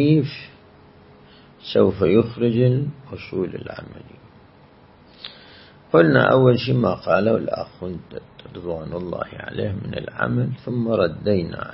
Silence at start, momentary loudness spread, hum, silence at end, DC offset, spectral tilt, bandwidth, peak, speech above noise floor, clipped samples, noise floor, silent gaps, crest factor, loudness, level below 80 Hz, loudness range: 0 s; 22 LU; none; 0 s; under 0.1%; -11.5 dB/octave; 5.8 kHz; -2 dBFS; 29 dB; under 0.1%; -50 dBFS; none; 20 dB; -21 LUFS; -52 dBFS; 8 LU